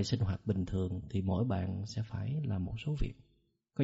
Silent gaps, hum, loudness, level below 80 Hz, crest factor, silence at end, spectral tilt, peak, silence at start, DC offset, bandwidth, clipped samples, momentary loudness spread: none; none; -36 LUFS; -48 dBFS; 18 dB; 0 s; -7.5 dB/octave; -18 dBFS; 0 s; under 0.1%; 8 kHz; under 0.1%; 6 LU